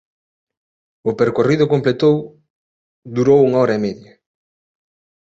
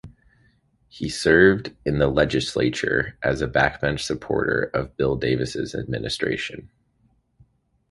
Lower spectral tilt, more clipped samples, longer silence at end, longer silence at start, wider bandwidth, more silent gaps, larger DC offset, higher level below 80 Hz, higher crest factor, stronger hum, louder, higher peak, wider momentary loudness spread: first, -7.5 dB/octave vs -5.5 dB/octave; neither; about the same, 1.25 s vs 1.25 s; first, 1.05 s vs 0.05 s; second, 7.8 kHz vs 11.5 kHz; first, 2.50-3.02 s vs none; neither; second, -56 dBFS vs -42 dBFS; second, 16 dB vs 22 dB; neither; first, -16 LUFS vs -22 LUFS; about the same, -2 dBFS vs -2 dBFS; about the same, 13 LU vs 11 LU